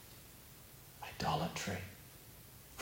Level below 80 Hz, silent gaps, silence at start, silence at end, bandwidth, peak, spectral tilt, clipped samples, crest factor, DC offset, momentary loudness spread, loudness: -62 dBFS; none; 0 s; 0 s; 16.5 kHz; -24 dBFS; -4 dB/octave; under 0.1%; 22 dB; under 0.1%; 18 LU; -41 LUFS